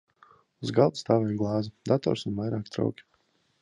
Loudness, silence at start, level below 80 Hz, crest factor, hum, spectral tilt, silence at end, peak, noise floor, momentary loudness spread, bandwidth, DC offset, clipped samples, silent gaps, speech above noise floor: -28 LUFS; 0.6 s; -60 dBFS; 22 dB; none; -7.5 dB/octave; 0.6 s; -8 dBFS; -70 dBFS; 7 LU; 10.5 kHz; under 0.1%; under 0.1%; none; 43 dB